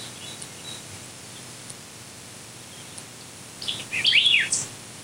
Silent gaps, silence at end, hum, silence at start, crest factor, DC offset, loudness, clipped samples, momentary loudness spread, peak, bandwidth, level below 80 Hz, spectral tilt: none; 0 s; none; 0 s; 22 dB; under 0.1%; -20 LUFS; under 0.1%; 23 LU; -6 dBFS; 16 kHz; -66 dBFS; 0 dB/octave